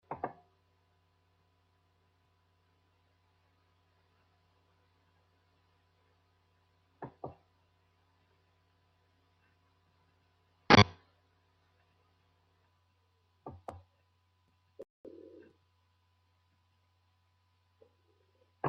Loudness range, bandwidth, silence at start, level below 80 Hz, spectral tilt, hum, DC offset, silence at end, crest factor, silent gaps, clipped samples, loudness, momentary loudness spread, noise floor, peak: 25 LU; 6.2 kHz; 0.1 s; -68 dBFS; -3.5 dB/octave; none; under 0.1%; 0 s; 36 dB; 14.90-15.04 s; under 0.1%; -26 LUFS; 28 LU; -74 dBFS; -6 dBFS